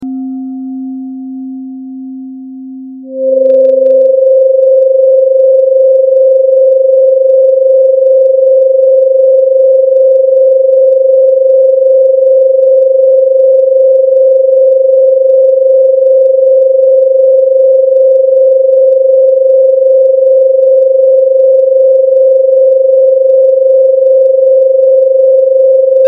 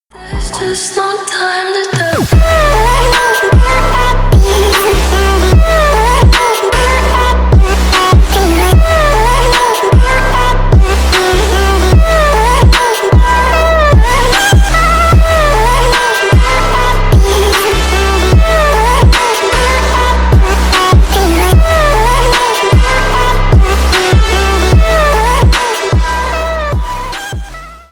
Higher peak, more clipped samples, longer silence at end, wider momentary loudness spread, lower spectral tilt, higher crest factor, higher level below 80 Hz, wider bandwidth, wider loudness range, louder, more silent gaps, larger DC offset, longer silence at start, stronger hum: about the same, 0 dBFS vs 0 dBFS; first, 0.4% vs under 0.1%; second, 0 s vs 0.15 s; first, 13 LU vs 6 LU; first, -8.5 dB/octave vs -4.5 dB/octave; about the same, 6 dB vs 8 dB; second, -74 dBFS vs -12 dBFS; second, 0.8 kHz vs over 20 kHz; about the same, 2 LU vs 2 LU; first, -6 LUFS vs -9 LUFS; neither; neither; second, 0 s vs 0.2 s; neither